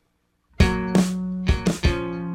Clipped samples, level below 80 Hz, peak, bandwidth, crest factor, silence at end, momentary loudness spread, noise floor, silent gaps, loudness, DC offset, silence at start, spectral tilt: under 0.1%; -30 dBFS; -4 dBFS; 15.5 kHz; 18 dB; 0 s; 5 LU; -69 dBFS; none; -23 LUFS; under 0.1%; 0.6 s; -6 dB/octave